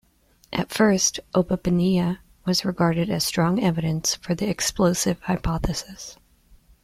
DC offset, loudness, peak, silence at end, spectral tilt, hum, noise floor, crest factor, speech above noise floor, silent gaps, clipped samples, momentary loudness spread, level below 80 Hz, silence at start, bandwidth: under 0.1%; -23 LUFS; -4 dBFS; 0.7 s; -4.5 dB/octave; none; -60 dBFS; 18 dB; 37 dB; none; under 0.1%; 9 LU; -42 dBFS; 0.5 s; 15.5 kHz